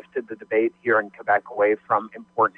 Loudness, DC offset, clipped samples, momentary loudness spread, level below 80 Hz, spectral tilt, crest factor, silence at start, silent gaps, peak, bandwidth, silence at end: -23 LUFS; under 0.1%; under 0.1%; 11 LU; -74 dBFS; -8.5 dB/octave; 16 dB; 0.15 s; none; -6 dBFS; 4 kHz; 0.1 s